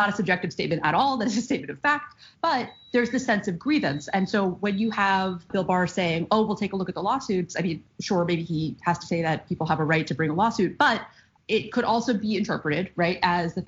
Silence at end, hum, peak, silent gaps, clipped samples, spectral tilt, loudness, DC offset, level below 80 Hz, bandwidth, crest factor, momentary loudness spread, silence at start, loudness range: 0 s; none; -8 dBFS; none; under 0.1%; -4 dB/octave; -25 LUFS; under 0.1%; -58 dBFS; 8 kHz; 18 dB; 6 LU; 0 s; 2 LU